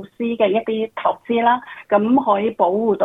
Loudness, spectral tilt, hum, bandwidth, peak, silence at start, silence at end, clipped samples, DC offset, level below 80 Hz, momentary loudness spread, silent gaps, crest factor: -19 LUFS; -8.5 dB/octave; none; 4 kHz; -2 dBFS; 0 s; 0 s; under 0.1%; under 0.1%; -66 dBFS; 6 LU; none; 16 dB